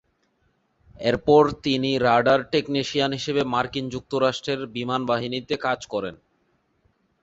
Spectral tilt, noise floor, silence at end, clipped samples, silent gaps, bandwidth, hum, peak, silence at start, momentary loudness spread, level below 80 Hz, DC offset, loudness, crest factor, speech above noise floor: -5.5 dB/octave; -68 dBFS; 1.1 s; under 0.1%; none; 8 kHz; none; -4 dBFS; 1 s; 10 LU; -54 dBFS; under 0.1%; -23 LUFS; 20 dB; 45 dB